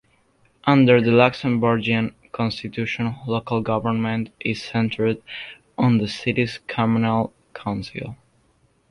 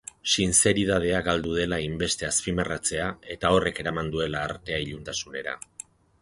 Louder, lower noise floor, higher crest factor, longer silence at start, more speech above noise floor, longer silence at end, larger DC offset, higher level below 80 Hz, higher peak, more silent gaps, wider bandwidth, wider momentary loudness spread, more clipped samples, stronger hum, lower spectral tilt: first, -21 LUFS vs -25 LUFS; first, -62 dBFS vs -47 dBFS; about the same, 20 dB vs 20 dB; first, 0.65 s vs 0.25 s; first, 41 dB vs 21 dB; about the same, 0.75 s vs 0.65 s; neither; second, -54 dBFS vs -46 dBFS; first, -2 dBFS vs -6 dBFS; neither; about the same, 10.5 kHz vs 11.5 kHz; about the same, 14 LU vs 13 LU; neither; neither; first, -7.5 dB/octave vs -3 dB/octave